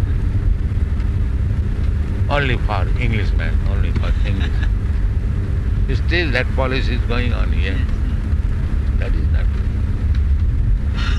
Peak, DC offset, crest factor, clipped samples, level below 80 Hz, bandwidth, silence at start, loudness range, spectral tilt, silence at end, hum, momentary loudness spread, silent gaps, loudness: -2 dBFS; under 0.1%; 14 dB; under 0.1%; -18 dBFS; 6.8 kHz; 0 s; 1 LU; -7.5 dB/octave; 0 s; none; 3 LU; none; -20 LUFS